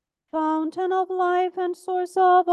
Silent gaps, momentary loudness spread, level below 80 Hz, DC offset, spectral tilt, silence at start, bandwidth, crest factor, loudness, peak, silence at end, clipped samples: none; 9 LU; -78 dBFS; under 0.1%; -4 dB/octave; 0.35 s; 12 kHz; 14 dB; -23 LUFS; -8 dBFS; 0 s; under 0.1%